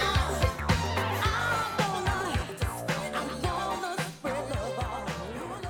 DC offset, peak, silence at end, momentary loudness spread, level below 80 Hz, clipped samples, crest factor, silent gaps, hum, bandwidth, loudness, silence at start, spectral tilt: under 0.1%; -10 dBFS; 0 s; 7 LU; -40 dBFS; under 0.1%; 20 dB; none; none; 19 kHz; -30 LUFS; 0 s; -4.5 dB/octave